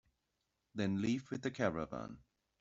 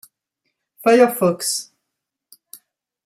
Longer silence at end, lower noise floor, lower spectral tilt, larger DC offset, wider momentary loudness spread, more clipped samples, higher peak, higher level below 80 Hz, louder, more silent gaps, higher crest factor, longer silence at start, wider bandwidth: second, 0.4 s vs 1.45 s; first, -85 dBFS vs -81 dBFS; first, -6 dB/octave vs -4 dB/octave; neither; first, 14 LU vs 9 LU; neither; second, -18 dBFS vs -2 dBFS; about the same, -68 dBFS vs -72 dBFS; second, -39 LUFS vs -17 LUFS; neither; about the same, 22 dB vs 18 dB; about the same, 0.75 s vs 0.8 s; second, 7.8 kHz vs 16 kHz